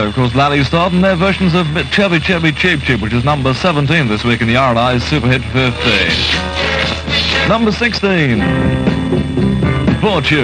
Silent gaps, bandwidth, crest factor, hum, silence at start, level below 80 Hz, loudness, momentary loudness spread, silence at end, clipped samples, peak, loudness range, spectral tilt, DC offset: none; 9.8 kHz; 12 dB; none; 0 s; -28 dBFS; -13 LUFS; 3 LU; 0 s; under 0.1%; 0 dBFS; 1 LU; -6 dB/octave; under 0.1%